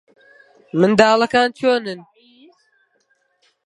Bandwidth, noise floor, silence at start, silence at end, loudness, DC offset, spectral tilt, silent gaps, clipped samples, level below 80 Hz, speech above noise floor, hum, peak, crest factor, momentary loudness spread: 11.5 kHz; -64 dBFS; 0.75 s; 1.65 s; -16 LUFS; under 0.1%; -5 dB/octave; none; under 0.1%; -62 dBFS; 49 dB; none; 0 dBFS; 20 dB; 15 LU